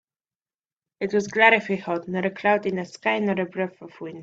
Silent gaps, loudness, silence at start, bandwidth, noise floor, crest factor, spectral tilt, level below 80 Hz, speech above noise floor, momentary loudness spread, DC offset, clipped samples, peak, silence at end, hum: none; -23 LUFS; 1 s; 8 kHz; under -90 dBFS; 22 dB; -5.5 dB/octave; -68 dBFS; over 66 dB; 14 LU; under 0.1%; under 0.1%; -2 dBFS; 0 s; none